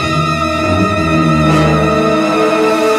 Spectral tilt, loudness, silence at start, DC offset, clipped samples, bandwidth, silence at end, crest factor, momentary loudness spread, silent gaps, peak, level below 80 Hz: -6 dB/octave; -12 LUFS; 0 s; under 0.1%; under 0.1%; 14.5 kHz; 0 s; 12 dB; 3 LU; none; 0 dBFS; -30 dBFS